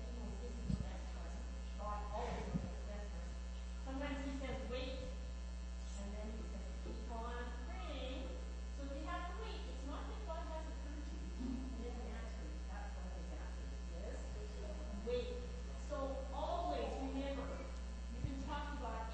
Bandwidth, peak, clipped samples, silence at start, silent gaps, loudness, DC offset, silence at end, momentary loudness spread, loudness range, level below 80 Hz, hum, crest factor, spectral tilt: 8.4 kHz; -26 dBFS; under 0.1%; 0 s; none; -46 LUFS; under 0.1%; 0 s; 6 LU; 3 LU; -46 dBFS; none; 18 dB; -6 dB/octave